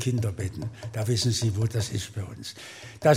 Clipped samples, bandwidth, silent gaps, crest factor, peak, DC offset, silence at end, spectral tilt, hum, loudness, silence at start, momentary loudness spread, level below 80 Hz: under 0.1%; 16 kHz; none; 20 dB; -8 dBFS; under 0.1%; 0 s; -5 dB/octave; none; -29 LUFS; 0 s; 14 LU; -56 dBFS